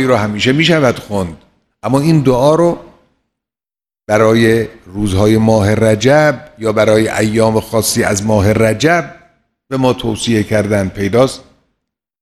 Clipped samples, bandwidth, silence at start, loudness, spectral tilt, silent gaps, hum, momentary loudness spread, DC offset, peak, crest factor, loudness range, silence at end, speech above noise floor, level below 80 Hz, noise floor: under 0.1%; 14.5 kHz; 0 s; -12 LUFS; -5.5 dB/octave; none; none; 10 LU; under 0.1%; 0 dBFS; 12 dB; 3 LU; 0.8 s; over 78 dB; -40 dBFS; under -90 dBFS